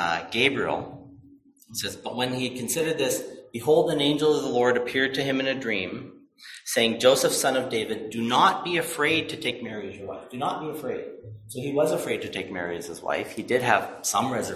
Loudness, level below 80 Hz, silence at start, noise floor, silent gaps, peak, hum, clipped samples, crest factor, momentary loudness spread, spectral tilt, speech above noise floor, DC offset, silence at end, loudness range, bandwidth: -25 LUFS; -62 dBFS; 0 s; -54 dBFS; none; -4 dBFS; none; under 0.1%; 22 dB; 15 LU; -3.5 dB/octave; 28 dB; under 0.1%; 0 s; 6 LU; 15.5 kHz